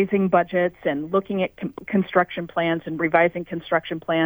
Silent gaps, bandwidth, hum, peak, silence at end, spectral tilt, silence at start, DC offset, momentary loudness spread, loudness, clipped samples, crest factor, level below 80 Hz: none; over 20 kHz; none; -4 dBFS; 0 s; -8.5 dB/octave; 0 s; under 0.1%; 7 LU; -23 LUFS; under 0.1%; 18 dB; -60 dBFS